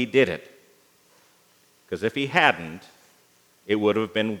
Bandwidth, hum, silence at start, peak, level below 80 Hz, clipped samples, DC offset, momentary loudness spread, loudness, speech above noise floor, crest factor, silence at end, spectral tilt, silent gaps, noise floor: 17 kHz; 60 Hz at -65 dBFS; 0 s; -2 dBFS; -70 dBFS; under 0.1%; under 0.1%; 18 LU; -23 LUFS; 37 dB; 24 dB; 0 s; -5.5 dB/octave; none; -60 dBFS